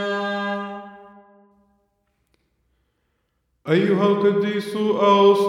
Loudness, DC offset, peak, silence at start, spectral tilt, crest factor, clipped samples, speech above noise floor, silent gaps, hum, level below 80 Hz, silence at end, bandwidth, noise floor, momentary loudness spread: -20 LUFS; under 0.1%; -4 dBFS; 0 s; -6.5 dB/octave; 18 dB; under 0.1%; 54 dB; none; none; -72 dBFS; 0 s; 12 kHz; -71 dBFS; 16 LU